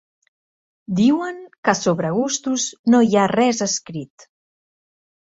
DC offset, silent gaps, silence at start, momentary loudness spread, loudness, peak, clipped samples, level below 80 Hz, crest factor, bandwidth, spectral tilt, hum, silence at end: under 0.1%; 1.58-1.63 s, 2.79-2.84 s; 0.9 s; 13 LU; -19 LUFS; -2 dBFS; under 0.1%; -62 dBFS; 18 dB; 8 kHz; -4.5 dB/octave; none; 1.15 s